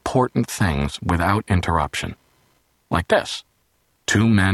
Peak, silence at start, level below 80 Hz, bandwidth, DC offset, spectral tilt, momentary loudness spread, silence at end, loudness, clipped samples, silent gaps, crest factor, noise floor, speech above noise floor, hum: -4 dBFS; 0.05 s; -38 dBFS; 13 kHz; under 0.1%; -5.5 dB/octave; 11 LU; 0 s; -21 LUFS; under 0.1%; none; 18 dB; -65 dBFS; 46 dB; none